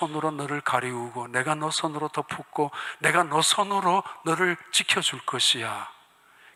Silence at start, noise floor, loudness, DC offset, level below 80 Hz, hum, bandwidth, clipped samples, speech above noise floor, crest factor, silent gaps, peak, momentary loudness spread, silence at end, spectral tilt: 0 s; -56 dBFS; -25 LUFS; under 0.1%; -74 dBFS; none; 16 kHz; under 0.1%; 30 dB; 20 dB; none; -6 dBFS; 11 LU; 0.65 s; -2.5 dB/octave